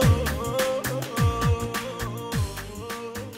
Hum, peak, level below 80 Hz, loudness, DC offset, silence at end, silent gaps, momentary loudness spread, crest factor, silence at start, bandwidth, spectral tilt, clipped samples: none; -8 dBFS; -36 dBFS; -27 LUFS; under 0.1%; 0 s; none; 10 LU; 16 dB; 0 s; 16.5 kHz; -5.5 dB/octave; under 0.1%